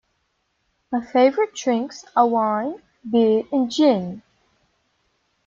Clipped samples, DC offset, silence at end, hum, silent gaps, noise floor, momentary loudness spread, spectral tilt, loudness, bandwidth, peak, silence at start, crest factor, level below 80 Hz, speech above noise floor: under 0.1%; under 0.1%; 1.3 s; none; none; -71 dBFS; 11 LU; -5.5 dB/octave; -20 LUFS; 7.6 kHz; -4 dBFS; 0.9 s; 18 dB; -66 dBFS; 51 dB